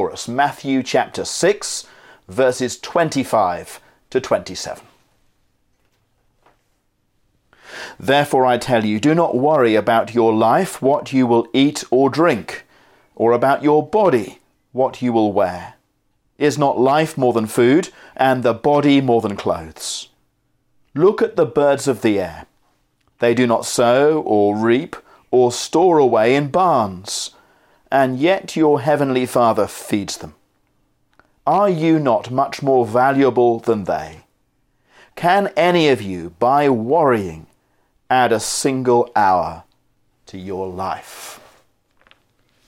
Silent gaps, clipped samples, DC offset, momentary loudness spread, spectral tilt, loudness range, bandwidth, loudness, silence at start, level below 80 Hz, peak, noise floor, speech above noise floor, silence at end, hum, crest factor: none; under 0.1%; under 0.1%; 13 LU; -5 dB/octave; 5 LU; 16.5 kHz; -17 LUFS; 0 s; -58 dBFS; -2 dBFS; -65 dBFS; 49 dB; 1.3 s; none; 16 dB